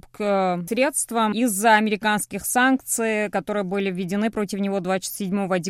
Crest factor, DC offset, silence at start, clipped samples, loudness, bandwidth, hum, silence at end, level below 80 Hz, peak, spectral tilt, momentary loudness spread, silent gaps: 18 dB; under 0.1%; 0.2 s; under 0.1%; -22 LUFS; 16 kHz; none; 0 s; -58 dBFS; -4 dBFS; -4 dB/octave; 7 LU; none